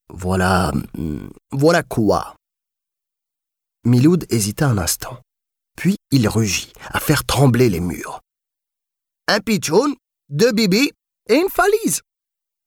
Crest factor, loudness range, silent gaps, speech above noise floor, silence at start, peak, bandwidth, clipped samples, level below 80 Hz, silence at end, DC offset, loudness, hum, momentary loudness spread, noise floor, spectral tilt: 16 dB; 2 LU; none; 68 dB; 0.1 s; -4 dBFS; 19 kHz; under 0.1%; -42 dBFS; 0.65 s; under 0.1%; -18 LUFS; none; 12 LU; -85 dBFS; -5 dB/octave